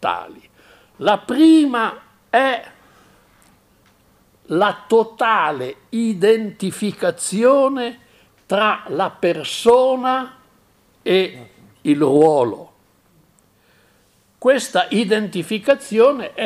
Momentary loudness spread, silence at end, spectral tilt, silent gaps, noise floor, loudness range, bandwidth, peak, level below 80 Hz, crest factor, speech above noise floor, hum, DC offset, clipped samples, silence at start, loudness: 11 LU; 0 s; -4.5 dB/octave; none; -57 dBFS; 3 LU; 15 kHz; -2 dBFS; -62 dBFS; 16 dB; 41 dB; none; under 0.1%; under 0.1%; 0 s; -17 LUFS